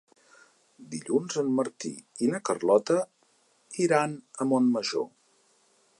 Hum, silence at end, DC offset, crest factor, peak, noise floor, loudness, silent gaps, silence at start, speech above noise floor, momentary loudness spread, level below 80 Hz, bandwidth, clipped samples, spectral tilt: none; 0.9 s; under 0.1%; 20 dB; -10 dBFS; -66 dBFS; -27 LUFS; none; 0.8 s; 40 dB; 15 LU; -82 dBFS; 11.5 kHz; under 0.1%; -5 dB/octave